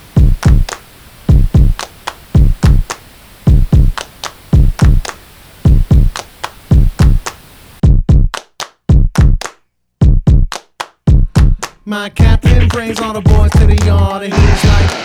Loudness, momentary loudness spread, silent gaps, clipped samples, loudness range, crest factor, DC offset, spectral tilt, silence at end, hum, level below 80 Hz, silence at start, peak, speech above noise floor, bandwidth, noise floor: -12 LUFS; 14 LU; none; 1%; 2 LU; 10 dB; under 0.1%; -6.5 dB/octave; 0 s; none; -12 dBFS; 0.15 s; 0 dBFS; 43 dB; 14 kHz; -51 dBFS